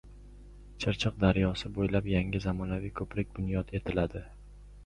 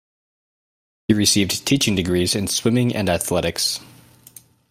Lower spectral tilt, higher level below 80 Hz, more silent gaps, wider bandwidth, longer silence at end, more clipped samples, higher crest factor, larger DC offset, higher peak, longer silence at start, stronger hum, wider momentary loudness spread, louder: first, -7 dB/octave vs -4 dB/octave; first, -44 dBFS vs -50 dBFS; neither; second, 10.5 kHz vs 16 kHz; second, 0 s vs 0.85 s; neither; about the same, 22 dB vs 18 dB; neither; second, -10 dBFS vs -2 dBFS; second, 0.05 s vs 1.1 s; first, 50 Hz at -45 dBFS vs none; first, 9 LU vs 5 LU; second, -32 LUFS vs -19 LUFS